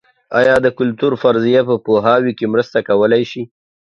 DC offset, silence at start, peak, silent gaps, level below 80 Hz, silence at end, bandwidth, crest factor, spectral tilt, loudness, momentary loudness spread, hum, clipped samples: under 0.1%; 0.3 s; 0 dBFS; none; -54 dBFS; 0.4 s; 7.8 kHz; 14 dB; -7 dB/octave; -14 LUFS; 6 LU; none; under 0.1%